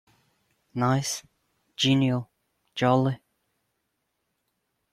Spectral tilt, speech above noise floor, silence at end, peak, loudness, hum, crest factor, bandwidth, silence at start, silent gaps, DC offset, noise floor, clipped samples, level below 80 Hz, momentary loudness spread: -5 dB/octave; 54 dB; 1.75 s; -8 dBFS; -25 LUFS; none; 20 dB; 14.5 kHz; 0.75 s; none; under 0.1%; -78 dBFS; under 0.1%; -62 dBFS; 17 LU